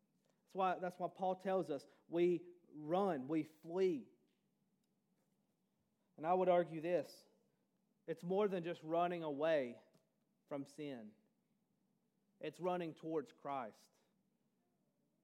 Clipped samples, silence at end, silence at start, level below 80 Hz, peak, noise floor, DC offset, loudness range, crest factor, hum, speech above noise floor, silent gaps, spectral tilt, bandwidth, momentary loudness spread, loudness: under 0.1%; 1.5 s; 0.55 s; under -90 dBFS; -24 dBFS; -84 dBFS; under 0.1%; 7 LU; 20 dB; none; 43 dB; none; -7 dB/octave; 13.5 kHz; 14 LU; -41 LUFS